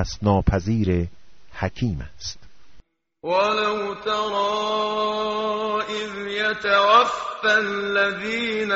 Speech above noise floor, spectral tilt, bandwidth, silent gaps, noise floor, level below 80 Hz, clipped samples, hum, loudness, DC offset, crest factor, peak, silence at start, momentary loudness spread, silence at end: 25 dB; -3 dB/octave; 8 kHz; none; -47 dBFS; -40 dBFS; under 0.1%; none; -22 LUFS; under 0.1%; 18 dB; -4 dBFS; 0 s; 11 LU; 0 s